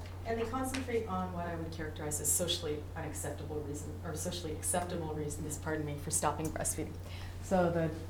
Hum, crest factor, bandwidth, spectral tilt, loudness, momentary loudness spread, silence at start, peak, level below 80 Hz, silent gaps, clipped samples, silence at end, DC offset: none; 20 dB; over 20 kHz; -4 dB/octave; -36 LUFS; 10 LU; 0 s; -18 dBFS; -52 dBFS; none; under 0.1%; 0 s; under 0.1%